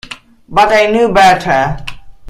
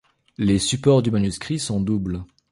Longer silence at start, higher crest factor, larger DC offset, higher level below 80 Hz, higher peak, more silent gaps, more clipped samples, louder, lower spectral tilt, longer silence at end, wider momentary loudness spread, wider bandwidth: second, 0.1 s vs 0.4 s; about the same, 12 dB vs 16 dB; neither; first, -34 dBFS vs -42 dBFS; first, 0 dBFS vs -4 dBFS; neither; neither; first, -10 LUFS vs -21 LUFS; about the same, -4.5 dB/octave vs -5.5 dB/octave; second, 0 s vs 0.25 s; first, 21 LU vs 9 LU; first, 15.5 kHz vs 11.5 kHz